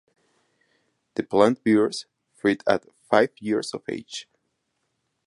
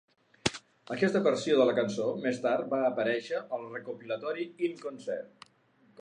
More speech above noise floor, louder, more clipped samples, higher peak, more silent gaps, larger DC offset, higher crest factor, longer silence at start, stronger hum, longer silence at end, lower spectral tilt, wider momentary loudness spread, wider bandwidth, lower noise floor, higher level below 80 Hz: first, 53 dB vs 35 dB; first, -24 LUFS vs -31 LUFS; neither; first, -2 dBFS vs -8 dBFS; neither; neither; about the same, 22 dB vs 24 dB; first, 1.2 s vs 0.45 s; neither; first, 1.05 s vs 0.75 s; about the same, -5 dB/octave vs -5 dB/octave; about the same, 13 LU vs 14 LU; about the same, 11.5 kHz vs 10.5 kHz; first, -76 dBFS vs -65 dBFS; about the same, -66 dBFS vs -68 dBFS